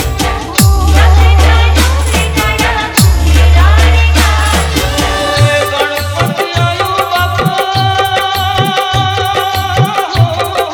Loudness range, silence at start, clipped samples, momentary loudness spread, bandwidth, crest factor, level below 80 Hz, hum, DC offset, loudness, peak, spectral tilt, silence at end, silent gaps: 3 LU; 0 s; 0.3%; 6 LU; 20 kHz; 10 dB; -12 dBFS; none; under 0.1%; -10 LUFS; 0 dBFS; -4.5 dB/octave; 0 s; none